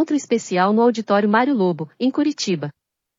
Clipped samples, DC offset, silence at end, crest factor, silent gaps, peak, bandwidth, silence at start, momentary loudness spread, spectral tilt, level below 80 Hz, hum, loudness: under 0.1%; under 0.1%; 0.5 s; 14 dB; none; -4 dBFS; 7.6 kHz; 0 s; 7 LU; -5.5 dB/octave; -78 dBFS; none; -19 LUFS